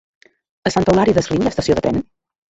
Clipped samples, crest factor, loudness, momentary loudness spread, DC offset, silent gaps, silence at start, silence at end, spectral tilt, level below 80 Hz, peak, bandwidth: under 0.1%; 16 dB; -17 LUFS; 10 LU; under 0.1%; none; 0.65 s; 0.5 s; -6 dB/octave; -40 dBFS; -2 dBFS; 8.2 kHz